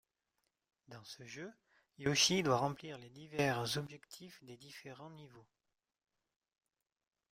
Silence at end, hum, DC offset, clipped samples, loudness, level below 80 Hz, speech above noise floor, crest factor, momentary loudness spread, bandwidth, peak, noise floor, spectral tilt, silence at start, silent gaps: 1.9 s; none; under 0.1%; under 0.1%; -35 LUFS; -74 dBFS; 47 dB; 24 dB; 24 LU; 16 kHz; -18 dBFS; -86 dBFS; -3.5 dB/octave; 0.9 s; none